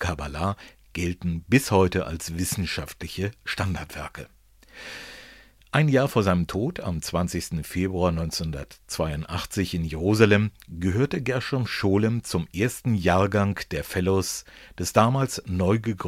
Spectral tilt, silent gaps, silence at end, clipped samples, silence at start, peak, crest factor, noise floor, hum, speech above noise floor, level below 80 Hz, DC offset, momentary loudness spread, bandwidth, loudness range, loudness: -5.5 dB/octave; none; 0 s; under 0.1%; 0 s; -2 dBFS; 24 dB; -50 dBFS; none; 26 dB; -44 dBFS; under 0.1%; 14 LU; 16 kHz; 4 LU; -25 LUFS